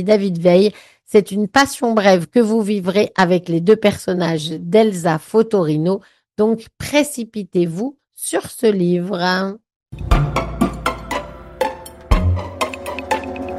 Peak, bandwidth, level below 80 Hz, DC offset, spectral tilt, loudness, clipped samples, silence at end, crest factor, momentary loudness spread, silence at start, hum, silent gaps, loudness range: -2 dBFS; 15.5 kHz; -30 dBFS; under 0.1%; -5.5 dB/octave; -18 LUFS; under 0.1%; 0 s; 16 dB; 11 LU; 0 s; none; 9.76-9.80 s; 6 LU